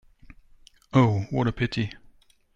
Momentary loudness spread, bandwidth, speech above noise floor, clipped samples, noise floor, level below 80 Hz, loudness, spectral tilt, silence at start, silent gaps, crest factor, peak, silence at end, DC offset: 9 LU; 7.6 kHz; 33 dB; under 0.1%; -56 dBFS; -50 dBFS; -25 LUFS; -7.5 dB/octave; 0.95 s; none; 18 dB; -8 dBFS; 0.65 s; under 0.1%